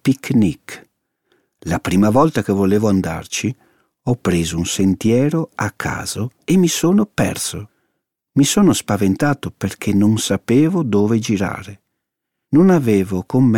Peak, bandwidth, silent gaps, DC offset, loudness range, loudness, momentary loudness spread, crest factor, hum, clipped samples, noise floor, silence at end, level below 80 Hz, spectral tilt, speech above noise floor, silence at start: -2 dBFS; 16.5 kHz; none; under 0.1%; 2 LU; -17 LUFS; 11 LU; 14 dB; none; under 0.1%; -78 dBFS; 0 s; -46 dBFS; -5.5 dB/octave; 62 dB; 0.05 s